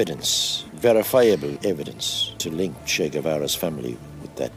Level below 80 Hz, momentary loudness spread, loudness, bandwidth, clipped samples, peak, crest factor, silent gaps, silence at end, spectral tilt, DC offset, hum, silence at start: -54 dBFS; 13 LU; -22 LUFS; 16 kHz; under 0.1%; -6 dBFS; 18 dB; none; 0 s; -3.5 dB/octave; under 0.1%; none; 0 s